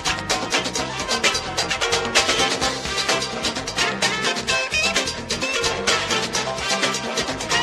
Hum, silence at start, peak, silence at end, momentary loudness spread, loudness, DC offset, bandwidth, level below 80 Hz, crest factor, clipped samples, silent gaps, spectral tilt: none; 0 s; -2 dBFS; 0 s; 5 LU; -20 LUFS; under 0.1%; 13 kHz; -44 dBFS; 20 dB; under 0.1%; none; -1.5 dB/octave